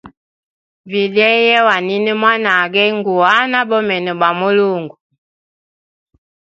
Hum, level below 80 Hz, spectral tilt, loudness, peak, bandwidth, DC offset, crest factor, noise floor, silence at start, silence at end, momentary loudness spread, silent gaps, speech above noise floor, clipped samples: none; -64 dBFS; -5.5 dB/octave; -13 LUFS; 0 dBFS; 7.6 kHz; under 0.1%; 16 dB; under -90 dBFS; 0.05 s; 1.7 s; 7 LU; 0.17-0.84 s; over 76 dB; under 0.1%